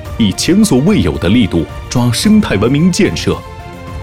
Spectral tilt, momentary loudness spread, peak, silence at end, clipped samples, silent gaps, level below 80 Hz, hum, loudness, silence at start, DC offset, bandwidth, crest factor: -5.5 dB/octave; 10 LU; 0 dBFS; 0 s; under 0.1%; none; -30 dBFS; none; -12 LUFS; 0 s; 0.7%; 16 kHz; 10 dB